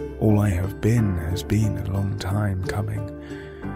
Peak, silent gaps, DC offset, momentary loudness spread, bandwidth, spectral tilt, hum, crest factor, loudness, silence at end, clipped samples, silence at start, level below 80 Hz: -8 dBFS; none; under 0.1%; 12 LU; 15.5 kHz; -7.5 dB/octave; none; 14 dB; -24 LUFS; 0 s; under 0.1%; 0 s; -40 dBFS